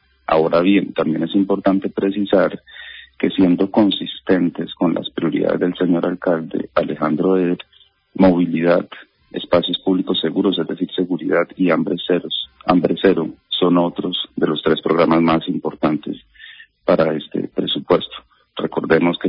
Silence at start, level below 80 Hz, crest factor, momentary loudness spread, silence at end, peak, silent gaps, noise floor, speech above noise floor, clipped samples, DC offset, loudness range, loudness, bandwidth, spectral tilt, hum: 0.3 s; -52 dBFS; 18 dB; 9 LU; 0 s; 0 dBFS; none; -42 dBFS; 25 dB; under 0.1%; under 0.1%; 2 LU; -18 LUFS; 5.4 kHz; -11.5 dB/octave; none